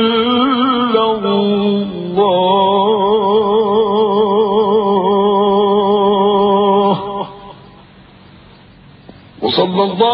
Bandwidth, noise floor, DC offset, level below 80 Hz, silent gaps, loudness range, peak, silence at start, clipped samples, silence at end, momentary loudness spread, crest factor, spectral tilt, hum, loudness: 5.4 kHz; -41 dBFS; under 0.1%; -50 dBFS; none; 6 LU; 0 dBFS; 0 s; under 0.1%; 0 s; 5 LU; 14 dB; -10 dB/octave; none; -13 LUFS